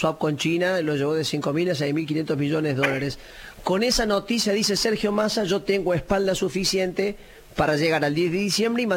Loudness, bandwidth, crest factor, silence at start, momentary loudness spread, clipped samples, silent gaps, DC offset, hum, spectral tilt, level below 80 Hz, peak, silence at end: -23 LUFS; 17 kHz; 16 dB; 0 s; 6 LU; under 0.1%; none; under 0.1%; none; -4.5 dB/octave; -46 dBFS; -8 dBFS; 0 s